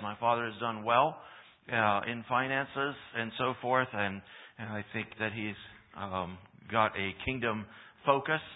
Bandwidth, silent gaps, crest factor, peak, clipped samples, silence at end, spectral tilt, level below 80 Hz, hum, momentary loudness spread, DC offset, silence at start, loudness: 4 kHz; none; 22 dB; -10 dBFS; under 0.1%; 0 s; -9 dB/octave; -62 dBFS; none; 16 LU; under 0.1%; 0 s; -32 LUFS